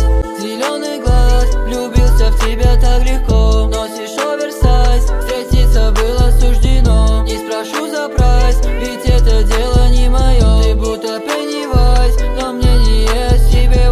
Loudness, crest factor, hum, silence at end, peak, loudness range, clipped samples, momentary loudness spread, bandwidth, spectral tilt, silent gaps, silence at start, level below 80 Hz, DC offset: -14 LUFS; 10 dB; none; 0 s; 0 dBFS; 1 LU; under 0.1%; 6 LU; 13 kHz; -5.5 dB/octave; none; 0 s; -10 dBFS; under 0.1%